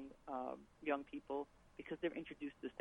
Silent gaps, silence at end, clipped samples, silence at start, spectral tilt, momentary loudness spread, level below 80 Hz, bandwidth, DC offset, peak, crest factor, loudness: none; 0 s; under 0.1%; 0 s; -6.5 dB/octave; 8 LU; -72 dBFS; 10.5 kHz; under 0.1%; -26 dBFS; 22 dB; -46 LUFS